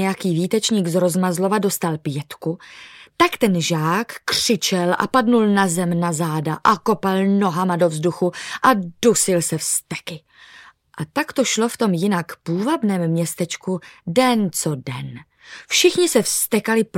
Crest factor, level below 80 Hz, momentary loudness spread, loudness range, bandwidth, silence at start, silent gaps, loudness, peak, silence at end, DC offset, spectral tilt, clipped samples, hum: 18 dB; -60 dBFS; 12 LU; 3 LU; 17 kHz; 0 s; none; -19 LUFS; -2 dBFS; 0 s; under 0.1%; -4 dB/octave; under 0.1%; none